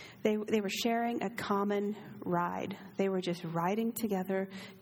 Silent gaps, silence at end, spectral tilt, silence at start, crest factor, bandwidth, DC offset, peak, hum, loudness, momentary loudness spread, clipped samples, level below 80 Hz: none; 0 s; -5.5 dB/octave; 0 s; 20 dB; 20 kHz; under 0.1%; -14 dBFS; none; -34 LUFS; 6 LU; under 0.1%; -74 dBFS